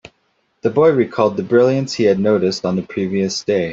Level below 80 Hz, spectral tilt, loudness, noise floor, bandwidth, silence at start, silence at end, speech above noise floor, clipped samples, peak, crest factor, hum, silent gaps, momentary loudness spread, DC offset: -58 dBFS; -6 dB/octave; -17 LUFS; -64 dBFS; 7.8 kHz; 0.65 s; 0 s; 49 dB; under 0.1%; -2 dBFS; 14 dB; none; none; 7 LU; under 0.1%